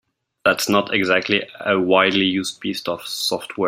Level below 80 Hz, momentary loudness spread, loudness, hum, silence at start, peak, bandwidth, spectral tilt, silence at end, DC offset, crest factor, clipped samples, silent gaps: -62 dBFS; 10 LU; -19 LUFS; none; 0.45 s; -2 dBFS; 16 kHz; -3.5 dB/octave; 0 s; under 0.1%; 18 dB; under 0.1%; none